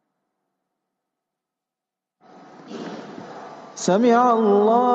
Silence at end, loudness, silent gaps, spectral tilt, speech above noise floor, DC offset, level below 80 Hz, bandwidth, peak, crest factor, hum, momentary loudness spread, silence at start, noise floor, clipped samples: 0 s; -17 LUFS; none; -5.5 dB/octave; 70 dB; under 0.1%; -80 dBFS; 8 kHz; -4 dBFS; 18 dB; none; 22 LU; 2.7 s; -87 dBFS; under 0.1%